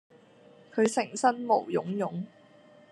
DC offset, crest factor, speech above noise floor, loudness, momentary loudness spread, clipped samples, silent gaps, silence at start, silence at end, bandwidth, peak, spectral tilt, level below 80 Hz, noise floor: under 0.1%; 20 dB; 29 dB; -29 LUFS; 11 LU; under 0.1%; none; 0.75 s; 0.65 s; 12 kHz; -10 dBFS; -5 dB/octave; -82 dBFS; -56 dBFS